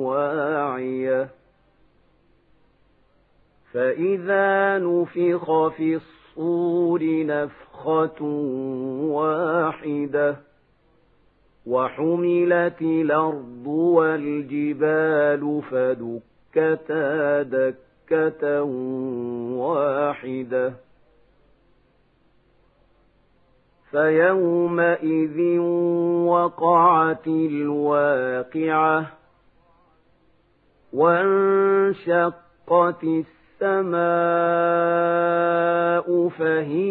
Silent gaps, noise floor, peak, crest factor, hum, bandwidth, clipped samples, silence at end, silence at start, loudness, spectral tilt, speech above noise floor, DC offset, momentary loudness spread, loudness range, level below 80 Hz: none; -61 dBFS; -6 dBFS; 18 dB; none; 4.1 kHz; under 0.1%; 0 s; 0 s; -22 LUFS; -11 dB/octave; 40 dB; under 0.1%; 9 LU; 7 LU; -68 dBFS